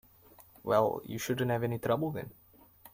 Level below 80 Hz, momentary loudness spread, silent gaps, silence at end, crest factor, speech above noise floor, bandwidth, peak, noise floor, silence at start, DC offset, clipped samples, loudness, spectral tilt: -66 dBFS; 14 LU; none; 0.05 s; 20 dB; 28 dB; 16.5 kHz; -12 dBFS; -59 dBFS; 0.4 s; under 0.1%; under 0.1%; -32 LUFS; -6 dB/octave